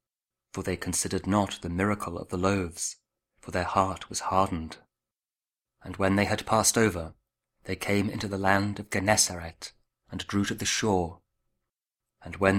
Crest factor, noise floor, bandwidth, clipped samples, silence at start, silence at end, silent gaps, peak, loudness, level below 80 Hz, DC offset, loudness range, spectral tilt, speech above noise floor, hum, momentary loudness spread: 24 dB; under -90 dBFS; 16 kHz; under 0.1%; 0.55 s; 0 s; none; -6 dBFS; -28 LUFS; -54 dBFS; under 0.1%; 4 LU; -4 dB/octave; over 62 dB; none; 18 LU